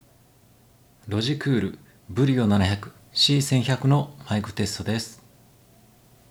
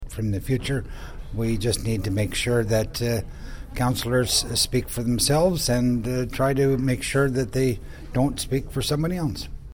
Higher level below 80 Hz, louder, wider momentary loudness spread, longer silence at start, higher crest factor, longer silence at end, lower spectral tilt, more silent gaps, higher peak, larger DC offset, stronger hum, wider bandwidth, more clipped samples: second, -60 dBFS vs -36 dBFS; about the same, -24 LUFS vs -24 LUFS; first, 12 LU vs 9 LU; first, 1.05 s vs 0 s; about the same, 18 dB vs 14 dB; first, 1.15 s vs 0.05 s; about the same, -5.5 dB/octave vs -5 dB/octave; neither; about the same, -8 dBFS vs -8 dBFS; neither; neither; second, 16 kHz vs 19.5 kHz; neither